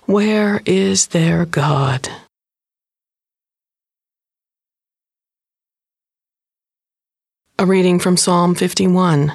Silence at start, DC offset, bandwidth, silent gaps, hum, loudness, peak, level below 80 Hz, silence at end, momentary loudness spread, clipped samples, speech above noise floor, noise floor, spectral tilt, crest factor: 0.1 s; under 0.1%; 13 kHz; none; none; -15 LUFS; -2 dBFS; -54 dBFS; 0 s; 6 LU; under 0.1%; over 76 dB; under -90 dBFS; -5 dB/octave; 16 dB